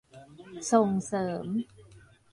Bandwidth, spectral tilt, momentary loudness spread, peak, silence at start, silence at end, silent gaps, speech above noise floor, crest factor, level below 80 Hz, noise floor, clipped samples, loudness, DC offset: 11.5 kHz; -6 dB/octave; 21 LU; -10 dBFS; 0.15 s; 0.35 s; none; 28 dB; 20 dB; -66 dBFS; -56 dBFS; under 0.1%; -29 LUFS; under 0.1%